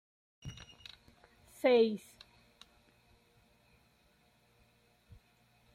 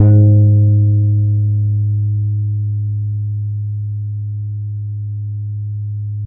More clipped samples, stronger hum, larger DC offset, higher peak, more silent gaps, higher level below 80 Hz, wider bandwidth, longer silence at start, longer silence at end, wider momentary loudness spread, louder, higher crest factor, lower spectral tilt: neither; first, 60 Hz at -75 dBFS vs none; neither; second, -18 dBFS vs 0 dBFS; neither; second, -68 dBFS vs -46 dBFS; first, 15 kHz vs 1 kHz; first, 0.45 s vs 0 s; first, 3.75 s vs 0 s; first, 27 LU vs 13 LU; second, -31 LUFS vs -16 LUFS; first, 22 dB vs 14 dB; second, -5.5 dB/octave vs -16 dB/octave